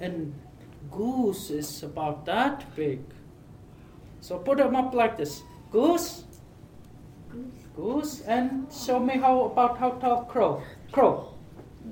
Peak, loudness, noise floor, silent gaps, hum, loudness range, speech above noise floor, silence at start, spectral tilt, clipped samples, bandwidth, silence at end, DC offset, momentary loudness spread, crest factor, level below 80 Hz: -8 dBFS; -27 LUFS; -48 dBFS; none; none; 6 LU; 22 dB; 0 s; -5.5 dB/octave; under 0.1%; 17.5 kHz; 0 s; under 0.1%; 19 LU; 20 dB; -54 dBFS